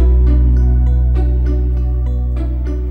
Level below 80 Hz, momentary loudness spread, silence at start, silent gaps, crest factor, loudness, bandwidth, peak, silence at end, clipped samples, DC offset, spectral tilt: -12 dBFS; 7 LU; 0 s; none; 8 dB; -16 LUFS; 2.3 kHz; -4 dBFS; 0 s; under 0.1%; under 0.1%; -10.5 dB/octave